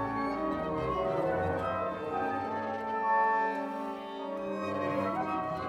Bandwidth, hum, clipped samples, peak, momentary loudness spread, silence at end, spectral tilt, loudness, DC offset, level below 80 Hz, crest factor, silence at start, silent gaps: 13.5 kHz; none; under 0.1%; -18 dBFS; 8 LU; 0 s; -7 dB/octave; -32 LUFS; under 0.1%; -56 dBFS; 14 dB; 0 s; none